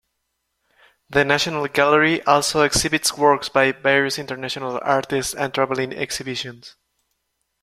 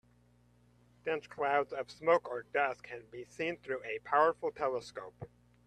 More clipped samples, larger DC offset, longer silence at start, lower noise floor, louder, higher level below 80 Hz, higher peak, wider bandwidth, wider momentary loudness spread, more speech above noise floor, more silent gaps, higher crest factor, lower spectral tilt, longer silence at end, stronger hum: neither; neither; about the same, 1.1 s vs 1.05 s; first, -75 dBFS vs -67 dBFS; first, -19 LUFS vs -34 LUFS; first, -50 dBFS vs -72 dBFS; first, -2 dBFS vs -14 dBFS; first, 16 kHz vs 9.6 kHz; second, 10 LU vs 17 LU; first, 55 dB vs 32 dB; neither; about the same, 20 dB vs 22 dB; second, -3 dB/octave vs -5 dB/octave; first, 0.95 s vs 0.4 s; second, none vs 60 Hz at -65 dBFS